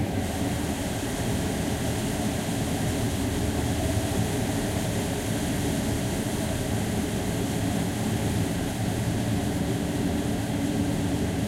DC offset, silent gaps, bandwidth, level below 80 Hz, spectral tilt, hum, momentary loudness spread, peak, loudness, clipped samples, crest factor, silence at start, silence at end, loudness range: under 0.1%; none; 16 kHz; -38 dBFS; -5.5 dB/octave; none; 2 LU; -14 dBFS; -27 LUFS; under 0.1%; 14 dB; 0 s; 0 s; 0 LU